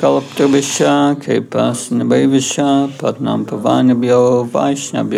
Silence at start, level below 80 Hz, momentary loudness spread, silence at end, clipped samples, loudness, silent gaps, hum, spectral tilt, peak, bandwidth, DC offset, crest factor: 0 s; -68 dBFS; 6 LU; 0 s; under 0.1%; -14 LUFS; none; none; -5 dB/octave; -2 dBFS; 14 kHz; under 0.1%; 12 dB